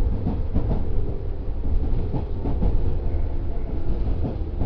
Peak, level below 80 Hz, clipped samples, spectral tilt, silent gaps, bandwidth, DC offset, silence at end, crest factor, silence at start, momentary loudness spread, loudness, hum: -8 dBFS; -24 dBFS; under 0.1%; -11 dB/octave; none; 4 kHz; under 0.1%; 0 s; 14 dB; 0 s; 5 LU; -28 LUFS; none